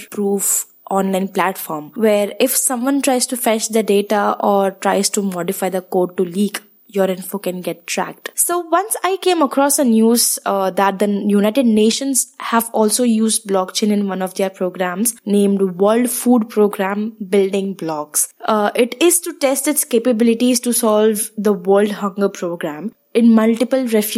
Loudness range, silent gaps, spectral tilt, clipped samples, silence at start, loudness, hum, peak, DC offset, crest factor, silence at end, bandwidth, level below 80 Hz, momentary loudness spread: 4 LU; none; -4 dB/octave; under 0.1%; 0 s; -16 LUFS; none; 0 dBFS; under 0.1%; 16 dB; 0 s; 16.5 kHz; -72 dBFS; 8 LU